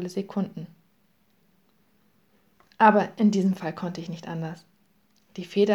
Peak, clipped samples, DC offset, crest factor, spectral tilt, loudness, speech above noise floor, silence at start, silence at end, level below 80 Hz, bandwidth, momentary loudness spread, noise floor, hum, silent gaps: -4 dBFS; under 0.1%; under 0.1%; 22 dB; -7 dB/octave; -25 LUFS; 43 dB; 0 s; 0 s; -76 dBFS; 11 kHz; 22 LU; -67 dBFS; none; none